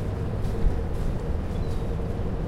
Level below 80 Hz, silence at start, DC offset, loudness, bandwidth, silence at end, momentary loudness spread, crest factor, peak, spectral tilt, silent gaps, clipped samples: -30 dBFS; 0 s; under 0.1%; -30 LUFS; 12 kHz; 0 s; 2 LU; 16 dB; -10 dBFS; -8 dB/octave; none; under 0.1%